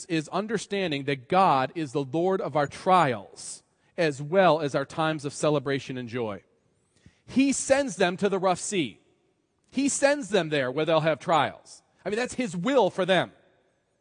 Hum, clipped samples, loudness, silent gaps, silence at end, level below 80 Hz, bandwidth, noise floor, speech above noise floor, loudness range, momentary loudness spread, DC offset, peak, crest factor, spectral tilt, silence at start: none; under 0.1%; -26 LUFS; none; 0.7 s; -68 dBFS; 10.5 kHz; -70 dBFS; 45 dB; 2 LU; 12 LU; under 0.1%; -8 dBFS; 20 dB; -4.5 dB/octave; 0 s